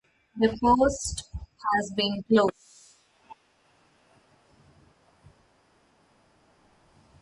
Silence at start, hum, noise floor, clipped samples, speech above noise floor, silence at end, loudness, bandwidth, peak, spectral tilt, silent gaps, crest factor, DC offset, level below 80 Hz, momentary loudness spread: 0.35 s; none; -65 dBFS; under 0.1%; 41 dB; 3.9 s; -25 LUFS; 11.5 kHz; -8 dBFS; -4.5 dB/octave; none; 20 dB; under 0.1%; -50 dBFS; 14 LU